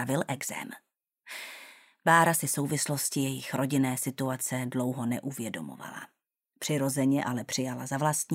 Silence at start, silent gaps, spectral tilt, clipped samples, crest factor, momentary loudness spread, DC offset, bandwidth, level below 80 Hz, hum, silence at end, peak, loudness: 0 s; none; -4.5 dB/octave; under 0.1%; 24 dB; 17 LU; under 0.1%; 16 kHz; -74 dBFS; none; 0 s; -8 dBFS; -29 LUFS